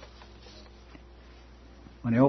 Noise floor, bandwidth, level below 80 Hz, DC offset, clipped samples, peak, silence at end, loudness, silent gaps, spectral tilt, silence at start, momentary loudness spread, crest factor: -51 dBFS; 6.2 kHz; -52 dBFS; under 0.1%; under 0.1%; -8 dBFS; 0 s; -38 LUFS; none; -9 dB/octave; 2.05 s; 16 LU; 22 dB